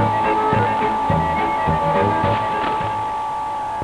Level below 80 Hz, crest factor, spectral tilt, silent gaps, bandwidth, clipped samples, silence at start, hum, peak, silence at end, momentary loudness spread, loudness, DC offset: -40 dBFS; 12 dB; -7 dB/octave; none; 11 kHz; under 0.1%; 0 s; none; -6 dBFS; 0 s; 6 LU; -19 LUFS; 0.1%